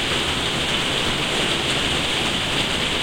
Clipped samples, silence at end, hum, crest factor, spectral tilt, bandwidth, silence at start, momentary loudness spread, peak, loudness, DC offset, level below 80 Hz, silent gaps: under 0.1%; 0 s; none; 14 dB; -2.5 dB/octave; 16.5 kHz; 0 s; 1 LU; -8 dBFS; -20 LUFS; under 0.1%; -38 dBFS; none